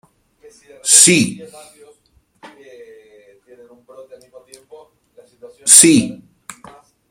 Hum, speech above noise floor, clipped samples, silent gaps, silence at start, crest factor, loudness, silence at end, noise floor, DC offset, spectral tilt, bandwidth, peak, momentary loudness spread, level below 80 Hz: none; 44 dB; 0.2%; none; 0.85 s; 18 dB; -9 LUFS; 1 s; -58 dBFS; under 0.1%; -2 dB/octave; 16.5 kHz; 0 dBFS; 19 LU; -58 dBFS